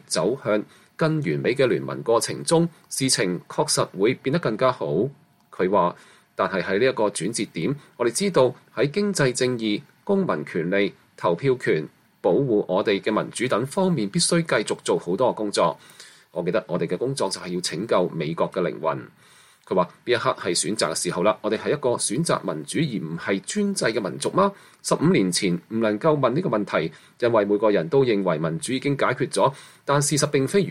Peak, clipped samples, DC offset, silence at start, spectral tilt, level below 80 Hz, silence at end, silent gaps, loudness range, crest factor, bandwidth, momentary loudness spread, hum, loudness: -6 dBFS; under 0.1%; under 0.1%; 0.1 s; -4.5 dB/octave; -64 dBFS; 0 s; none; 3 LU; 18 dB; 15.5 kHz; 6 LU; none; -23 LUFS